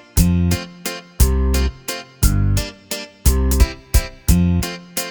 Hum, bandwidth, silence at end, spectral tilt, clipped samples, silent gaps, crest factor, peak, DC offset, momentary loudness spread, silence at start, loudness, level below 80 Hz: none; over 20 kHz; 0 s; -5 dB/octave; under 0.1%; none; 16 dB; -2 dBFS; under 0.1%; 11 LU; 0.15 s; -19 LUFS; -20 dBFS